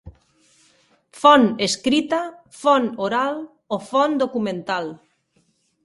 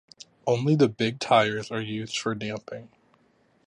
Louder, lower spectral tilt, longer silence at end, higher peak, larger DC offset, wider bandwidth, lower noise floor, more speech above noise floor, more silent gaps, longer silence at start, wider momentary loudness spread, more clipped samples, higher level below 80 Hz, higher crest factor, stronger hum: first, -20 LUFS vs -25 LUFS; second, -4 dB/octave vs -5.5 dB/octave; about the same, 0.9 s vs 0.8 s; first, 0 dBFS vs -8 dBFS; neither; about the same, 11.5 kHz vs 11 kHz; about the same, -65 dBFS vs -64 dBFS; first, 46 dB vs 39 dB; neither; second, 0.05 s vs 0.45 s; about the same, 15 LU vs 13 LU; neither; first, -58 dBFS vs -66 dBFS; about the same, 22 dB vs 20 dB; neither